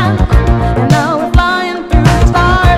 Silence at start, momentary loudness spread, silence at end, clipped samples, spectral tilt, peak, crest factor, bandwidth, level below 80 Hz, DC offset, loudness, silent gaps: 0 s; 4 LU; 0 s; 0.8%; -6.5 dB/octave; 0 dBFS; 8 dB; 13.5 kHz; -14 dBFS; under 0.1%; -11 LUFS; none